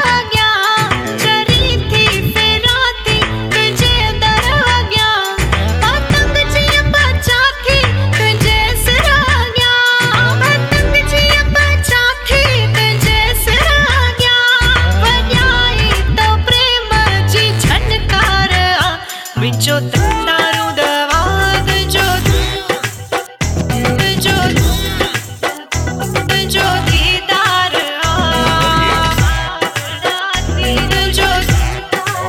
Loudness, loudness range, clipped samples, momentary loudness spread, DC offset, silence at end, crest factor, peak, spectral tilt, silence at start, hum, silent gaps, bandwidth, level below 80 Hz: -12 LUFS; 4 LU; under 0.1%; 7 LU; under 0.1%; 0 s; 12 dB; 0 dBFS; -3.5 dB/octave; 0 s; none; none; 19 kHz; -20 dBFS